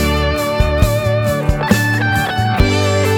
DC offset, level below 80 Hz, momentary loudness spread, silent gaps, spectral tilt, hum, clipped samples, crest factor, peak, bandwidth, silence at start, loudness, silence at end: under 0.1%; -22 dBFS; 3 LU; none; -5.5 dB/octave; none; under 0.1%; 14 dB; 0 dBFS; 18.5 kHz; 0 s; -15 LUFS; 0 s